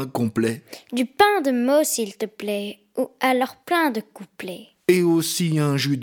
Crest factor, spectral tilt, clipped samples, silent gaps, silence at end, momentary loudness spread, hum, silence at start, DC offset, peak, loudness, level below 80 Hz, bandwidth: 18 dB; -4.5 dB/octave; under 0.1%; none; 0 s; 15 LU; none; 0 s; under 0.1%; -4 dBFS; -22 LUFS; -66 dBFS; 19 kHz